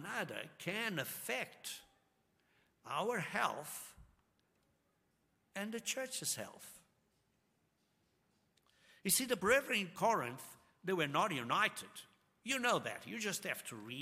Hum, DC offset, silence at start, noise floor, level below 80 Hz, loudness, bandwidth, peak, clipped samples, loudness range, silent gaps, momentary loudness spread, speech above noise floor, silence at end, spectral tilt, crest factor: none; under 0.1%; 0 s; -79 dBFS; -76 dBFS; -38 LUFS; 16 kHz; -18 dBFS; under 0.1%; 9 LU; none; 17 LU; 40 dB; 0 s; -2.5 dB/octave; 24 dB